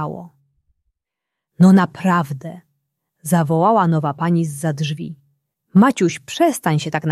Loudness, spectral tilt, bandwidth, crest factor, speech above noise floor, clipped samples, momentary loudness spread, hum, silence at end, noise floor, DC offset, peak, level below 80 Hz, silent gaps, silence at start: -17 LUFS; -6.5 dB/octave; 14 kHz; 16 dB; 66 dB; under 0.1%; 16 LU; none; 0 s; -82 dBFS; under 0.1%; -2 dBFS; -62 dBFS; none; 0 s